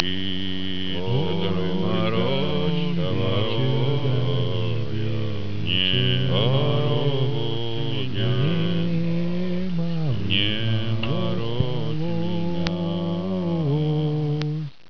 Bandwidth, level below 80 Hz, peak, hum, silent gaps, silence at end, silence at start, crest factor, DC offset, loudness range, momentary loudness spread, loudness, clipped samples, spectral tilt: 5.4 kHz; -48 dBFS; 0 dBFS; none; none; 0 s; 0 s; 22 dB; 5%; 2 LU; 6 LU; -24 LUFS; under 0.1%; -8 dB/octave